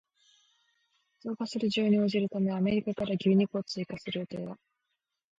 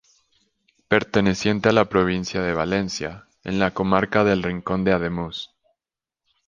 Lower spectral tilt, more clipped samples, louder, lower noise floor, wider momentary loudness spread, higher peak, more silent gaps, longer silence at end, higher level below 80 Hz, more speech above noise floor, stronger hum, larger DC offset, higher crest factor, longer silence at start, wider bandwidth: first, -7 dB/octave vs -5.5 dB/octave; neither; second, -30 LUFS vs -22 LUFS; second, -84 dBFS vs -89 dBFS; about the same, 14 LU vs 12 LU; second, -16 dBFS vs -2 dBFS; neither; second, 0.85 s vs 1 s; second, -68 dBFS vs -46 dBFS; second, 55 dB vs 68 dB; neither; neither; second, 16 dB vs 22 dB; first, 1.25 s vs 0.9 s; about the same, 7.8 kHz vs 7.4 kHz